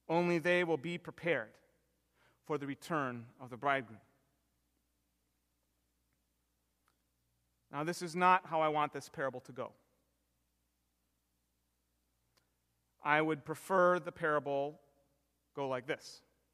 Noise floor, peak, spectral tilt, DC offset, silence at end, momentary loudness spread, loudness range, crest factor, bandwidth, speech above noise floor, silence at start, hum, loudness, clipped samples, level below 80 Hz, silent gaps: -81 dBFS; -14 dBFS; -5.5 dB/octave; under 0.1%; 0.35 s; 17 LU; 12 LU; 26 dB; 15 kHz; 46 dB; 0.1 s; 60 Hz at -70 dBFS; -35 LUFS; under 0.1%; -80 dBFS; none